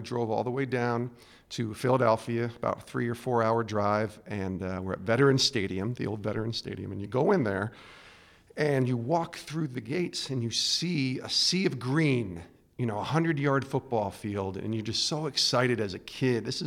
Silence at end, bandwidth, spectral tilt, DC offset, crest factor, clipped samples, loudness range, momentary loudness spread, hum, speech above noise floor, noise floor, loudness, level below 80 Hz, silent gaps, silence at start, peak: 0 s; 15.5 kHz; -5 dB/octave; under 0.1%; 18 dB; under 0.1%; 2 LU; 10 LU; none; 26 dB; -55 dBFS; -29 LUFS; -62 dBFS; none; 0 s; -10 dBFS